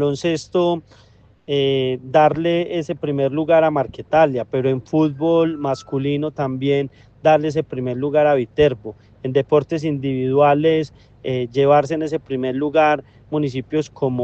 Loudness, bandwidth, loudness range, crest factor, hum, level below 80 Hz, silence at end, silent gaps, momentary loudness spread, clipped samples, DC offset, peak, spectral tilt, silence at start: -19 LUFS; 8.4 kHz; 2 LU; 16 dB; none; -52 dBFS; 0 s; none; 9 LU; under 0.1%; under 0.1%; -2 dBFS; -7 dB/octave; 0 s